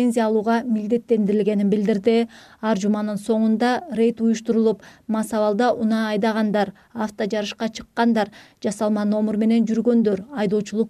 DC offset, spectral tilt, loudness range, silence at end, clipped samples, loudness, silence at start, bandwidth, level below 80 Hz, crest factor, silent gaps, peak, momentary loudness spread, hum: under 0.1%; -6.5 dB/octave; 2 LU; 0 s; under 0.1%; -21 LUFS; 0 s; 12.5 kHz; -62 dBFS; 14 dB; none; -6 dBFS; 8 LU; none